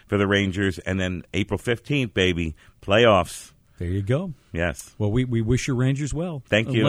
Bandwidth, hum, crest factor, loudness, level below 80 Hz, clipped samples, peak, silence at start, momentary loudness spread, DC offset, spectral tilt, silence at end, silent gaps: 15 kHz; none; 18 dB; -23 LUFS; -42 dBFS; under 0.1%; -4 dBFS; 0.1 s; 11 LU; under 0.1%; -6 dB/octave; 0 s; none